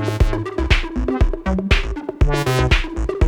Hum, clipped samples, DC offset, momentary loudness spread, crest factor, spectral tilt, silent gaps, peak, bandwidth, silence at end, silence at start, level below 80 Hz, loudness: none; under 0.1%; under 0.1%; 6 LU; 16 dB; -6 dB/octave; none; -2 dBFS; 17.5 kHz; 0 s; 0 s; -20 dBFS; -20 LUFS